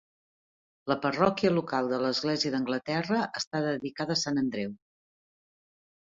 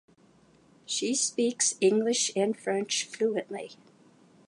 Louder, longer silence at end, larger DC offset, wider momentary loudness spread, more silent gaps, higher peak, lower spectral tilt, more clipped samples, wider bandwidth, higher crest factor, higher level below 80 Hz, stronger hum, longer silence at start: about the same, -29 LUFS vs -27 LUFS; first, 1.35 s vs 0.75 s; neither; second, 7 LU vs 10 LU; first, 3.47-3.51 s vs none; about the same, -10 dBFS vs -12 dBFS; first, -5 dB/octave vs -2.5 dB/octave; neither; second, 7.8 kHz vs 11.5 kHz; about the same, 22 dB vs 18 dB; first, -66 dBFS vs -82 dBFS; neither; about the same, 0.85 s vs 0.9 s